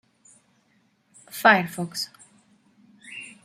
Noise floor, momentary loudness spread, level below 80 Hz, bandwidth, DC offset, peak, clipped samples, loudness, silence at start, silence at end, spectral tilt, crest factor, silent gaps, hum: -66 dBFS; 21 LU; -74 dBFS; 16 kHz; under 0.1%; -2 dBFS; under 0.1%; -22 LUFS; 1.35 s; 0.2 s; -4 dB/octave; 26 dB; none; none